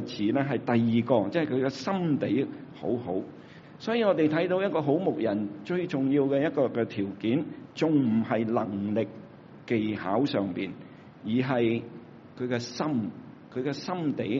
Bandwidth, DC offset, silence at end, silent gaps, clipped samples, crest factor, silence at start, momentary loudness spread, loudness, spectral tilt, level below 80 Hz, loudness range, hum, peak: 7.4 kHz; under 0.1%; 0 s; none; under 0.1%; 18 dB; 0 s; 13 LU; -28 LUFS; -6 dB/octave; -70 dBFS; 3 LU; none; -10 dBFS